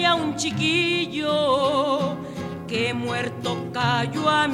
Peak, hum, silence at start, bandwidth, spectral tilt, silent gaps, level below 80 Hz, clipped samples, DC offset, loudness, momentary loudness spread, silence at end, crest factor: -6 dBFS; none; 0 s; 16 kHz; -4.5 dB/octave; none; -58 dBFS; under 0.1%; under 0.1%; -23 LUFS; 8 LU; 0 s; 16 dB